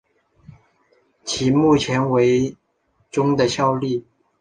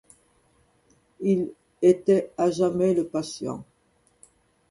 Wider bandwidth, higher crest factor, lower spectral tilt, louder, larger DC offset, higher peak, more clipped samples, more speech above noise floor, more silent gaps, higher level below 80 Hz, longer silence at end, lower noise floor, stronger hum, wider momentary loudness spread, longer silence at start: second, 10 kHz vs 11.5 kHz; about the same, 16 dB vs 20 dB; second, -5.5 dB/octave vs -7 dB/octave; first, -19 LUFS vs -24 LUFS; neither; about the same, -4 dBFS vs -6 dBFS; neither; first, 47 dB vs 43 dB; neither; first, -52 dBFS vs -64 dBFS; second, 0.4 s vs 1.1 s; about the same, -65 dBFS vs -65 dBFS; neither; about the same, 11 LU vs 13 LU; about the same, 1.25 s vs 1.2 s